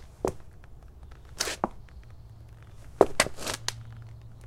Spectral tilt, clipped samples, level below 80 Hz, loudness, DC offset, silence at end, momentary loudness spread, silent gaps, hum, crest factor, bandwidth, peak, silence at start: -3 dB/octave; under 0.1%; -48 dBFS; -29 LUFS; under 0.1%; 0 s; 25 LU; none; none; 32 dB; 16.5 kHz; 0 dBFS; 0 s